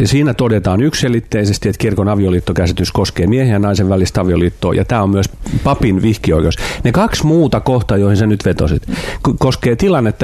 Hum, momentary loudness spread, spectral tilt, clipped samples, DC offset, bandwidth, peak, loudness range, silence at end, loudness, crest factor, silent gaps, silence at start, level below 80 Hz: none; 4 LU; -6.5 dB/octave; under 0.1%; under 0.1%; 14 kHz; 0 dBFS; 1 LU; 0 s; -14 LUFS; 12 dB; none; 0 s; -28 dBFS